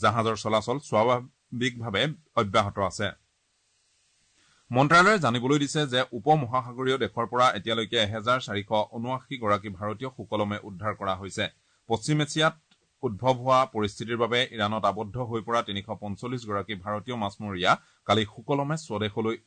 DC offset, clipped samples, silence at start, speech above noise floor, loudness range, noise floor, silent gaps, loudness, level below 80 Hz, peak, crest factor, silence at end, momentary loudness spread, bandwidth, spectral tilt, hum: under 0.1%; under 0.1%; 0 s; 45 dB; 6 LU; -71 dBFS; none; -27 LUFS; -62 dBFS; -10 dBFS; 18 dB; 0.1 s; 10 LU; 9.4 kHz; -5 dB/octave; none